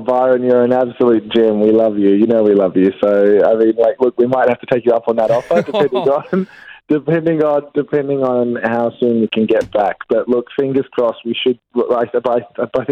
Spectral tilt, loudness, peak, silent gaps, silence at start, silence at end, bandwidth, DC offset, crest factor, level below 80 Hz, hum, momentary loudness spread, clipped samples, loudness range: -8 dB/octave; -15 LUFS; 0 dBFS; none; 0 s; 0 s; 8 kHz; under 0.1%; 14 dB; -56 dBFS; none; 6 LU; under 0.1%; 4 LU